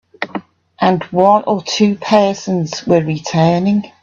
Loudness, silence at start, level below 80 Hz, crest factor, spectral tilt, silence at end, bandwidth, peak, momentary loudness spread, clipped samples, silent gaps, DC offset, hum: -15 LUFS; 0.2 s; -54 dBFS; 14 dB; -6 dB/octave; 0.15 s; 7.4 kHz; 0 dBFS; 10 LU; under 0.1%; none; under 0.1%; none